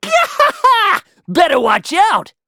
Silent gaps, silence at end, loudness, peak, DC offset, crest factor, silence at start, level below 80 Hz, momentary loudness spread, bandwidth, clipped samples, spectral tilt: none; 0.25 s; -13 LUFS; 0 dBFS; under 0.1%; 14 dB; 0.05 s; -54 dBFS; 4 LU; 18.5 kHz; under 0.1%; -3 dB/octave